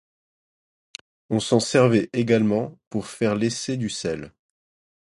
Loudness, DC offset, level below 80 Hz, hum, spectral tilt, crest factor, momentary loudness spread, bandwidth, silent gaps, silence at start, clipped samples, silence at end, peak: -23 LUFS; under 0.1%; -58 dBFS; none; -5.5 dB/octave; 20 dB; 19 LU; 11.5 kHz; 2.87-2.91 s; 1.3 s; under 0.1%; 0.75 s; -4 dBFS